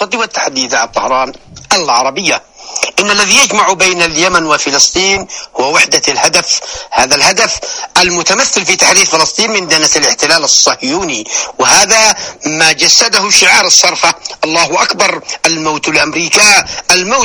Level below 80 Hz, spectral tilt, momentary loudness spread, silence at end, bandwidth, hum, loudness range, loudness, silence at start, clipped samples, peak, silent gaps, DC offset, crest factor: -44 dBFS; -0.5 dB/octave; 9 LU; 0 s; over 20 kHz; none; 3 LU; -8 LUFS; 0 s; 1%; 0 dBFS; none; under 0.1%; 10 dB